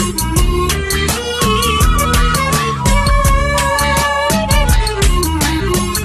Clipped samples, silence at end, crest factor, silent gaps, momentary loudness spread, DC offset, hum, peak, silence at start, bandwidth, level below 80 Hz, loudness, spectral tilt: under 0.1%; 0 s; 12 dB; none; 3 LU; under 0.1%; none; 0 dBFS; 0 s; 13.5 kHz; -18 dBFS; -14 LUFS; -4 dB/octave